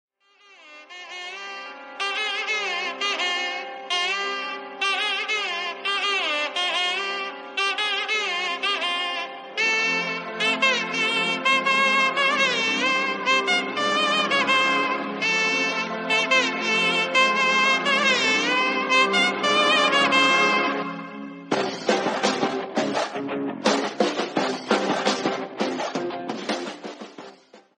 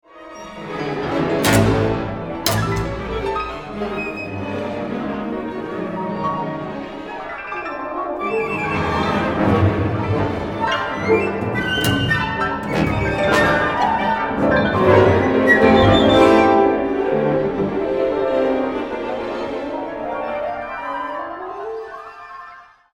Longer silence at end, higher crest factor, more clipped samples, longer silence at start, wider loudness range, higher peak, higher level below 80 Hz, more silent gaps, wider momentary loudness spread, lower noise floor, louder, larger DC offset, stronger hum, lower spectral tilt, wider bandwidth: second, 0.2 s vs 0.35 s; about the same, 18 dB vs 18 dB; neither; first, 0.65 s vs 0.15 s; second, 7 LU vs 11 LU; second, -4 dBFS vs 0 dBFS; second, -80 dBFS vs -38 dBFS; neither; second, 12 LU vs 16 LU; first, -55 dBFS vs -42 dBFS; second, -22 LUFS vs -19 LUFS; neither; neither; second, -2 dB/octave vs -6 dB/octave; second, 11.5 kHz vs 17 kHz